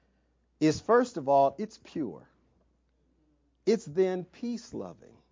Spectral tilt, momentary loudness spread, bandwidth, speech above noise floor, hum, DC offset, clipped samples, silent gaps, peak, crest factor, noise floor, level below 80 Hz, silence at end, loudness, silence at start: -6 dB/octave; 15 LU; 7.6 kHz; 42 dB; none; under 0.1%; under 0.1%; none; -10 dBFS; 20 dB; -71 dBFS; -66 dBFS; 0.4 s; -29 LUFS; 0.6 s